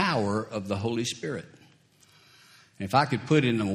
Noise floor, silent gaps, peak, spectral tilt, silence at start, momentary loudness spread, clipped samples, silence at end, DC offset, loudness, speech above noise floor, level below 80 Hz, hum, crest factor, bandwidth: -60 dBFS; none; -6 dBFS; -5.5 dB/octave; 0 s; 12 LU; under 0.1%; 0 s; under 0.1%; -27 LUFS; 33 dB; -66 dBFS; none; 22 dB; 14.5 kHz